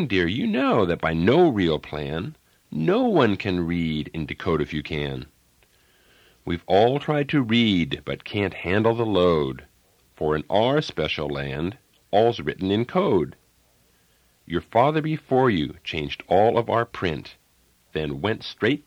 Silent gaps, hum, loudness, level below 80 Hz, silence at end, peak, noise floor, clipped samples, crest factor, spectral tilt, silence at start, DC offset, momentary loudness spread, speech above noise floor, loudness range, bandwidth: none; none; -23 LUFS; -48 dBFS; 0.05 s; -4 dBFS; -62 dBFS; under 0.1%; 18 dB; -7.5 dB/octave; 0 s; under 0.1%; 11 LU; 39 dB; 4 LU; 14 kHz